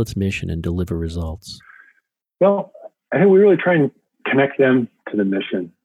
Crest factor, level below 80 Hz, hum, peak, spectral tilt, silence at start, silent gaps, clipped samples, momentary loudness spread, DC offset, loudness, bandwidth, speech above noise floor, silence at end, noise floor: 16 dB; -40 dBFS; none; -4 dBFS; -7.5 dB/octave; 0 s; none; under 0.1%; 16 LU; under 0.1%; -18 LUFS; 13 kHz; 47 dB; 0.15 s; -65 dBFS